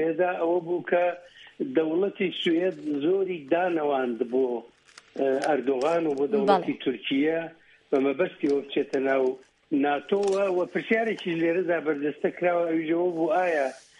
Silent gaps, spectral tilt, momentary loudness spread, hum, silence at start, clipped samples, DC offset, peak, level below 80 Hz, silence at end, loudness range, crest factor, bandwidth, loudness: none; -6 dB/octave; 5 LU; none; 0 s; under 0.1%; under 0.1%; -6 dBFS; -76 dBFS; 0.2 s; 1 LU; 18 dB; 11 kHz; -26 LUFS